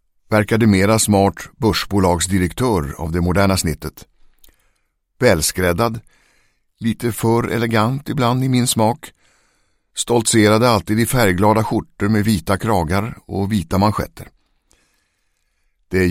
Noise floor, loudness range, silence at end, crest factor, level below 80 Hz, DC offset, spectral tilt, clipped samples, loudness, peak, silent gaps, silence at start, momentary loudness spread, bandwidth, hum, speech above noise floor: -66 dBFS; 5 LU; 0 s; 18 dB; -38 dBFS; under 0.1%; -5 dB/octave; under 0.1%; -17 LUFS; 0 dBFS; none; 0.3 s; 10 LU; 16.5 kHz; none; 50 dB